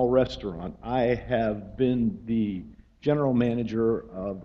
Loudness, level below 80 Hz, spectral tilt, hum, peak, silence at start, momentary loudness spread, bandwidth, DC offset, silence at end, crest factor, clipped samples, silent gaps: -27 LUFS; -48 dBFS; -8.5 dB/octave; none; -10 dBFS; 0 s; 10 LU; 7 kHz; under 0.1%; 0 s; 16 dB; under 0.1%; none